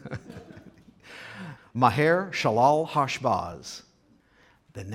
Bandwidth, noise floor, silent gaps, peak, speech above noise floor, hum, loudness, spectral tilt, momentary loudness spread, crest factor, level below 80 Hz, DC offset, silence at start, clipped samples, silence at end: 15.5 kHz; -62 dBFS; none; -6 dBFS; 38 dB; none; -24 LUFS; -5.5 dB/octave; 23 LU; 22 dB; -62 dBFS; under 0.1%; 0.05 s; under 0.1%; 0 s